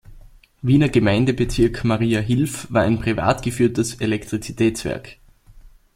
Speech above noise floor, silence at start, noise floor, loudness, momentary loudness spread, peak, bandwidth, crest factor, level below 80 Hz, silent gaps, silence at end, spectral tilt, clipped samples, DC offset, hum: 27 dB; 0.1 s; -46 dBFS; -20 LUFS; 9 LU; -2 dBFS; 16 kHz; 18 dB; -38 dBFS; none; 0.25 s; -6 dB/octave; under 0.1%; under 0.1%; none